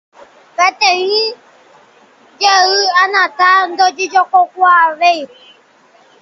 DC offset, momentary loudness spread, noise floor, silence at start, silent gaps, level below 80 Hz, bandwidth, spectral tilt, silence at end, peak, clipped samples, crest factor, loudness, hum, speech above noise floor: under 0.1%; 6 LU; -48 dBFS; 0.6 s; none; -68 dBFS; 7.4 kHz; 0.5 dB/octave; 0.95 s; 0 dBFS; under 0.1%; 14 dB; -11 LUFS; none; 36 dB